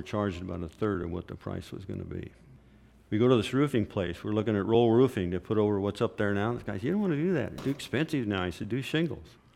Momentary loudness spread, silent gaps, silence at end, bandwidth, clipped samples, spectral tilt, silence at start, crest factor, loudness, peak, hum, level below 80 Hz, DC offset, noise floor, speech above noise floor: 14 LU; none; 0.25 s; 15 kHz; under 0.1%; -7 dB/octave; 0 s; 18 dB; -29 LUFS; -10 dBFS; none; -56 dBFS; under 0.1%; -57 dBFS; 28 dB